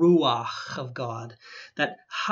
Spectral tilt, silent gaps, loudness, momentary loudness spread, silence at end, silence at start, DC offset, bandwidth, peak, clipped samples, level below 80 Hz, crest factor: -6 dB/octave; none; -27 LUFS; 18 LU; 0 s; 0 s; under 0.1%; 7.4 kHz; -10 dBFS; under 0.1%; -76 dBFS; 16 dB